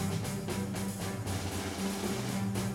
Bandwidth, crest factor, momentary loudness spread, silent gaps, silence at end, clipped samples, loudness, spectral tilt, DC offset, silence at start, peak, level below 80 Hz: 16.5 kHz; 14 dB; 2 LU; none; 0 s; under 0.1%; -35 LUFS; -5 dB/octave; under 0.1%; 0 s; -20 dBFS; -54 dBFS